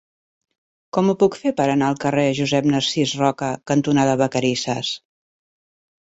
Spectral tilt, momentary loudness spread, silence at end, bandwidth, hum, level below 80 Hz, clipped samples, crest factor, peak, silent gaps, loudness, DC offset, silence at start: -5 dB/octave; 7 LU; 1.15 s; 8 kHz; none; -58 dBFS; under 0.1%; 16 dB; -4 dBFS; none; -20 LUFS; under 0.1%; 0.95 s